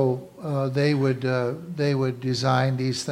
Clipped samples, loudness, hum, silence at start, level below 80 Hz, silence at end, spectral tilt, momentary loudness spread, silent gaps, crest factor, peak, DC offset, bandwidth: under 0.1%; -24 LUFS; none; 0 s; -64 dBFS; 0 s; -6.5 dB/octave; 6 LU; none; 18 dB; -6 dBFS; under 0.1%; 12.5 kHz